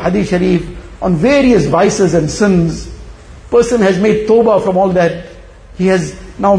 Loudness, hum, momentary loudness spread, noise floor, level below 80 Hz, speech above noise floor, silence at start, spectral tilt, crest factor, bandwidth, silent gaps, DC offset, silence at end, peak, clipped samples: -12 LUFS; none; 10 LU; -33 dBFS; -32 dBFS; 22 dB; 0 s; -6.5 dB/octave; 12 dB; 10.5 kHz; none; under 0.1%; 0 s; 0 dBFS; under 0.1%